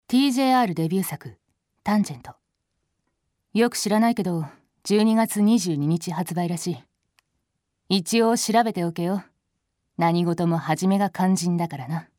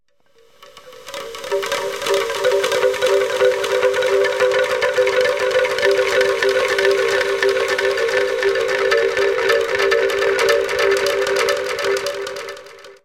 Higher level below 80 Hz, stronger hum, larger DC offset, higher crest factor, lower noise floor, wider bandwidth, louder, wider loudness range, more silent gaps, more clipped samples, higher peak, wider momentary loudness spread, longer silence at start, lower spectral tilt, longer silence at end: second, -68 dBFS vs -56 dBFS; neither; neither; about the same, 16 dB vs 16 dB; first, -77 dBFS vs -56 dBFS; about the same, 18 kHz vs 16.5 kHz; second, -23 LUFS vs -17 LUFS; about the same, 3 LU vs 2 LU; neither; neither; second, -8 dBFS vs -2 dBFS; first, 11 LU vs 7 LU; second, 0.1 s vs 0.6 s; first, -5.5 dB/octave vs -2 dB/octave; about the same, 0.15 s vs 0.1 s